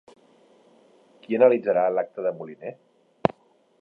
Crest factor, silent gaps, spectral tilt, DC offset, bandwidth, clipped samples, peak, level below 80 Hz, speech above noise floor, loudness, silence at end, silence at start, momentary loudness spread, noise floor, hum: 26 dB; none; -8.5 dB/octave; under 0.1%; 4.8 kHz; under 0.1%; 0 dBFS; -66 dBFS; 35 dB; -23 LUFS; 0.55 s; 1.3 s; 18 LU; -58 dBFS; none